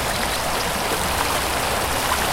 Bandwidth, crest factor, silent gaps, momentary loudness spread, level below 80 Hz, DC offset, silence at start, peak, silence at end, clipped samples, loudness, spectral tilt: 16.5 kHz; 18 dB; none; 1 LU; -34 dBFS; under 0.1%; 0 s; -4 dBFS; 0 s; under 0.1%; -21 LUFS; -2.5 dB/octave